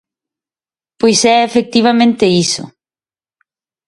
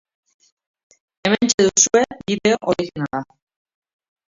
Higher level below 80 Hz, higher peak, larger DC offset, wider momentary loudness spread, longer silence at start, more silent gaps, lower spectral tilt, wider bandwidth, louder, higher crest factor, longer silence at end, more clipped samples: about the same, -54 dBFS vs -56 dBFS; about the same, 0 dBFS vs 0 dBFS; neither; second, 6 LU vs 12 LU; second, 1 s vs 1.25 s; second, none vs 1.54-1.58 s; about the same, -4 dB/octave vs -3 dB/octave; first, 11.5 kHz vs 7.8 kHz; first, -12 LUFS vs -18 LUFS; second, 14 dB vs 20 dB; about the same, 1.2 s vs 1.1 s; neither